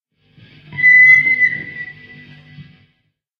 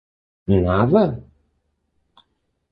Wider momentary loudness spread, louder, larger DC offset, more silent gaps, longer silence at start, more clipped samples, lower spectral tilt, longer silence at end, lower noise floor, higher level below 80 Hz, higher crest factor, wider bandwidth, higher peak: first, 25 LU vs 18 LU; first, -8 LUFS vs -18 LUFS; neither; neither; first, 0.7 s vs 0.5 s; neither; second, -4 dB/octave vs -11.5 dB/octave; second, 0.75 s vs 1.5 s; second, -66 dBFS vs -70 dBFS; second, -62 dBFS vs -38 dBFS; about the same, 16 dB vs 20 dB; first, 6.4 kHz vs 5.2 kHz; about the same, 0 dBFS vs -2 dBFS